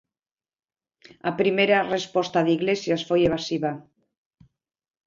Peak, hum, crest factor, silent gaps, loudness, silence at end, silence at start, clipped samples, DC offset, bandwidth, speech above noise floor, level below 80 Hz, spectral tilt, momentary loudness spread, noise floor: -6 dBFS; none; 20 dB; none; -23 LUFS; 1.25 s; 1.25 s; under 0.1%; under 0.1%; 7.6 kHz; over 67 dB; -58 dBFS; -5.5 dB/octave; 10 LU; under -90 dBFS